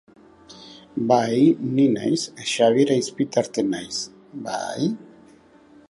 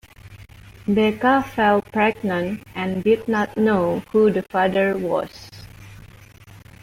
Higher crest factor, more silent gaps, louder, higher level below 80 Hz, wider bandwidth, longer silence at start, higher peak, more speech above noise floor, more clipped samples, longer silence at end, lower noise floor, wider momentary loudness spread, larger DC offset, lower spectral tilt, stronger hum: about the same, 18 dB vs 16 dB; neither; about the same, -22 LUFS vs -20 LUFS; second, -66 dBFS vs -52 dBFS; second, 11.5 kHz vs 16 kHz; first, 0.5 s vs 0.25 s; about the same, -4 dBFS vs -6 dBFS; first, 30 dB vs 25 dB; neither; first, 0.85 s vs 0.25 s; first, -51 dBFS vs -45 dBFS; first, 16 LU vs 10 LU; neither; second, -5 dB/octave vs -7 dB/octave; neither